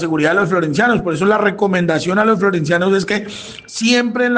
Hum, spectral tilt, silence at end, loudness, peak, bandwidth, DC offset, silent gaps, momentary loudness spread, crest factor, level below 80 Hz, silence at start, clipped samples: none; -5 dB/octave; 0 s; -15 LUFS; -2 dBFS; 9.6 kHz; under 0.1%; none; 6 LU; 14 dB; -52 dBFS; 0 s; under 0.1%